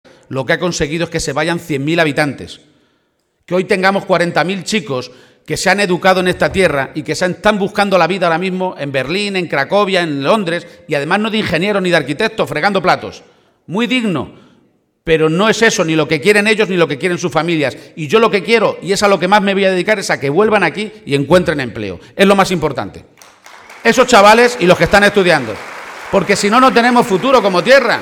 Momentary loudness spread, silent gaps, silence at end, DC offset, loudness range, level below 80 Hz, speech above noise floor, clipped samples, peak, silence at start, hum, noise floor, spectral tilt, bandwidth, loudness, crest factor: 11 LU; none; 0 s; under 0.1%; 6 LU; -44 dBFS; 50 dB; 0.1%; 0 dBFS; 0.3 s; none; -63 dBFS; -4.5 dB/octave; 17 kHz; -13 LUFS; 14 dB